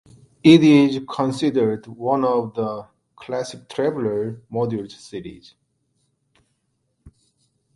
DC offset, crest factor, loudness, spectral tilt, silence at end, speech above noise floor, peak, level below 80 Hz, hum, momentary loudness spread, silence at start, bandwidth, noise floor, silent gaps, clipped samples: under 0.1%; 22 dB; -20 LUFS; -6.5 dB/octave; 0.65 s; 52 dB; 0 dBFS; -60 dBFS; none; 21 LU; 0.45 s; 11.5 kHz; -71 dBFS; none; under 0.1%